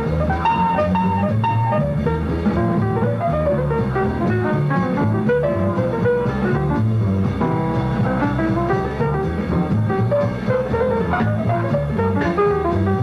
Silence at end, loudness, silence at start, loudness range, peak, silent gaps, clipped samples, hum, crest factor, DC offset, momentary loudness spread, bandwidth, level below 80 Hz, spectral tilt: 0 s; -19 LUFS; 0 s; 1 LU; -6 dBFS; none; under 0.1%; none; 12 dB; under 0.1%; 2 LU; 7 kHz; -34 dBFS; -9 dB/octave